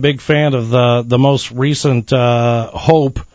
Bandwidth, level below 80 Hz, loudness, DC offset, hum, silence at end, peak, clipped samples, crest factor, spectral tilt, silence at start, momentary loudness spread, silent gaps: 8 kHz; -38 dBFS; -13 LUFS; under 0.1%; none; 0.1 s; 0 dBFS; under 0.1%; 12 dB; -6.5 dB/octave; 0 s; 3 LU; none